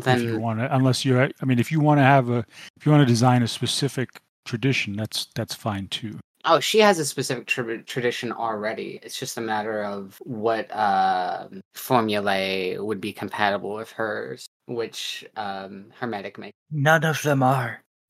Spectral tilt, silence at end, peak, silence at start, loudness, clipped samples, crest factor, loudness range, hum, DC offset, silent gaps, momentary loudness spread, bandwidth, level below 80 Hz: -5 dB/octave; 0.3 s; 0 dBFS; 0 s; -23 LUFS; under 0.1%; 22 dB; 8 LU; none; under 0.1%; 2.70-2.74 s, 4.29-4.43 s, 6.24-6.35 s, 11.65-11.71 s, 14.48-14.60 s, 16.55-16.66 s; 15 LU; 15.5 kHz; -70 dBFS